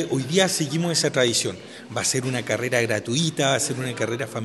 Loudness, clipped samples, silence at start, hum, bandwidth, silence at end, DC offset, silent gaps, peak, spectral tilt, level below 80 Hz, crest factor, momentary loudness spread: -23 LUFS; under 0.1%; 0 s; none; 13 kHz; 0 s; under 0.1%; none; -4 dBFS; -3.5 dB/octave; -66 dBFS; 18 dB; 7 LU